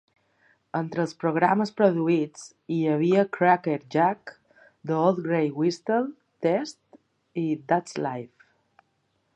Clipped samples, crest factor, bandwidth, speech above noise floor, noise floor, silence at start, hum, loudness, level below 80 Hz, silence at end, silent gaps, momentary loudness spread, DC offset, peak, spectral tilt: under 0.1%; 20 dB; 9.4 kHz; 48 dB; -72 dBFS; 0.75 s; none; -25 LUFS; -74 dBFS; 1.1 s; none; 14 LU; under 0.1%; -6 dBFS; -7 dB/octave